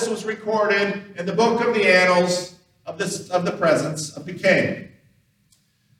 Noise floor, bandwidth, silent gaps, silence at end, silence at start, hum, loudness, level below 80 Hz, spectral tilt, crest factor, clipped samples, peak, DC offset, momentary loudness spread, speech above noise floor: -62 dBFS; 15 kHz; none; 1.1 s; 0 s; none; -20 LUFS; -68 dBFS; -4 dB/octave; 20 dB; under 0.1%; -2 dBFS; under 0.1%; 15 LU; 42 dB